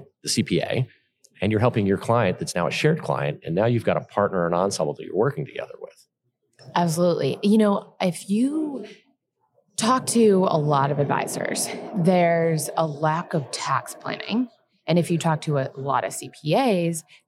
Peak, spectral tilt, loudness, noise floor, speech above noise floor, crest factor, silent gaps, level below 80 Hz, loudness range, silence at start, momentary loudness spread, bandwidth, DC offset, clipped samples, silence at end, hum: -6 dBFS; -5.5 dB/octave; -23 LUFS; -73 dBFS; 51 dB; 16 dB; none; -68 dBFS; 4 LU; 0 s; 12 LU; 15.5 kHz; under 0.1%; under 0.1%; 0.25 s; none